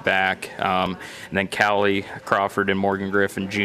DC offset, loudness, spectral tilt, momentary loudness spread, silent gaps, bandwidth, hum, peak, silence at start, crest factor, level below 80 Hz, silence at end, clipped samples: under 0.1%; -22 LUFS; -5 dB/octave; 7 LU; none; 15.5 kHz; none; -2 dBFS; 0 s; 20 dB; -58 dBFS; 0 s; under 0.1%